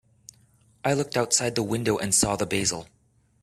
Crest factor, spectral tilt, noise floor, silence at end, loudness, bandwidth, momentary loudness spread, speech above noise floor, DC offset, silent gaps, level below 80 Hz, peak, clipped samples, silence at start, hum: 22 dB; -3 dB/octave; -64 dBFS; 0.6 s; -24 LUFS; 15.5 kHz; 6 LU; 39 dB; under 0.1%; none; -54 dBFS; -6 dBFS; under 0.1%; 0.85 s; none